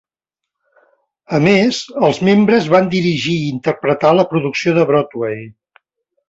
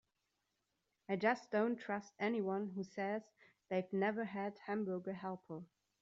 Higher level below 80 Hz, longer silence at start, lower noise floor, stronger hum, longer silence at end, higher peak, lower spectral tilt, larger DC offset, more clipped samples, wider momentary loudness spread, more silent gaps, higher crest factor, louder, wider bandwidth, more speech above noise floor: first, -54 dBFS vs -86 dBFS; first, 1.3 s vs 1.1 s; about the same, -83 dBFS vs -86 dBFS; neither; first, 0.8 s vs 0.35 s; first, 0 dBFS vs -20 dBFS; about the same, -6 dB/octave vs -5.5 dB/octave; neither; neither; about the same, 8 LU vs 10 LU; neither; second, 14 dB vs 22 dB; first, -14 LUFS vs -40 LUFS; about the same, 8 kHz vs 7.6 kHz; first, 69 dB vs 46 dB